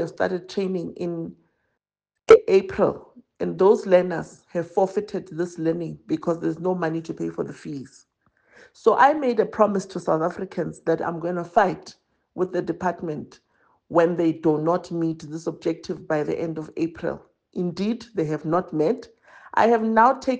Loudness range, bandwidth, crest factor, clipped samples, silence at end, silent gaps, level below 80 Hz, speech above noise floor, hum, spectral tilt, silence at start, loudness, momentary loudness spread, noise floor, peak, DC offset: 7 LU; 9 kHz; 20 dB; under 0.1%; 0 s; none; -60 dBFS; 63 dB; none; -7 dB/octave; 0 s; -23 LUFS; 14 LU; -85 dBFS; -4 dBFS; under 0.1%